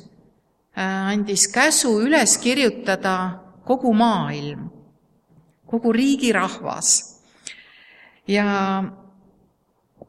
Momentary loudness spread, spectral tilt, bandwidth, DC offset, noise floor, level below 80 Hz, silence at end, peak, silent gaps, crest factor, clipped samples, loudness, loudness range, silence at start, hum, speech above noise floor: 20 LU; -3 dB/octave; 15 kHz; under 0.1%; -65 dBFS; -62 dBFS; 1.15 s; -4 dBFS; none; 18 dB; under 0.1%; -19 LUFS; 5 LU; 0.75 s; none; 46 dB